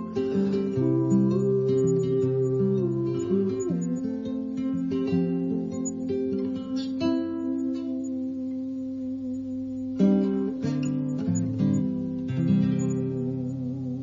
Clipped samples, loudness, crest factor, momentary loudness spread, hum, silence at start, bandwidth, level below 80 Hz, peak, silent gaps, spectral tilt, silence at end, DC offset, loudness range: under 0.1%; -27 LUFS; 16 dB; 9 LU; none; 0 s; 7.4 kHz; -62 dBFS; -10 dBFS; none; -8 dB/octave; 0 s; under 0.1%; 5 LU